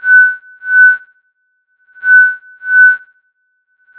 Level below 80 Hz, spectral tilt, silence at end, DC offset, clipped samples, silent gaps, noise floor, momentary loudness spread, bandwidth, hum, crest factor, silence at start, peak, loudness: -70 dBFS; -1 dB/octave; 1 s; under 0.1%; under 0.1%; none; -62 dBFS; 12 LU; 4 kHz; none; 12 dB; 0.05 s; 0 dBFS; -8 LUFS